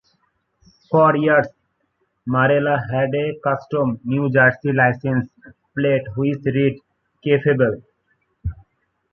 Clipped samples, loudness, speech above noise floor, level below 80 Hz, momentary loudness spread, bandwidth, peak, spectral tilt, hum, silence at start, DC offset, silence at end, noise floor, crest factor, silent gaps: under 0.1%; -19 LUFS; 51 dB; -46 dBFS; 17 LU; 6 kHz; -2 dBFS; -9.5 dB/octave; none; 0.9 s; under 0.1%; 0.6 s; -69 dBFS; 18 dB; none